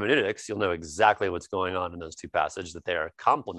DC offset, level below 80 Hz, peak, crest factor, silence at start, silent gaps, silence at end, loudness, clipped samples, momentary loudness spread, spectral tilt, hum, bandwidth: under 0.1%; -54 dBFS; -6 dBFS; 22 dB; 0 s; none; 0 s; -27 LUFS; under 0.1%; 9 LU; -4 dB/octave; none; 11.5 kHz